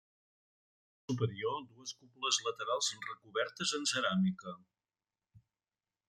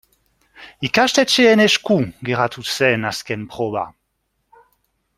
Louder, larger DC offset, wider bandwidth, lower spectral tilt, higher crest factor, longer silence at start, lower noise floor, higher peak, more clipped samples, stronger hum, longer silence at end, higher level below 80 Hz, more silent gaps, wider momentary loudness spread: second, -35 LUFS vs -17 LUFS; neither; second, 13 kHz vs 16 kHz; about the same, -3.5 dB/octave vs -4 dB/octave; about the same, 22 dB vs 18 dB; first, 1.1 s vs 0.6 s; first, under -90 dBFS vs -71 dBFS; second, -16 dBFS vs -2 dBFS; neither; neither; second, 0.7 s vs 1.25 s; second, -80 dBFS vs -58 dBFS; neither; about the same, 14 LU vs 14 LU